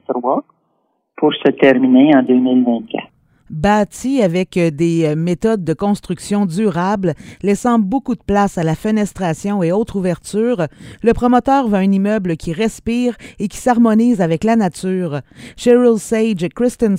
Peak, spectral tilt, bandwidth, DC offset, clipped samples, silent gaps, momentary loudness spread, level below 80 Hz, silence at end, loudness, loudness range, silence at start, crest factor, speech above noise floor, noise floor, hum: 0 dBFS; -6.5 dB/octave; 15 kHz; under 0.1%; under 0.1%; none; 9 LU; -42 dBFS; 0 s; -16 LUFS; 3 LU; 0.1 s; 16 dB; 50 dB; -65 dBFS; none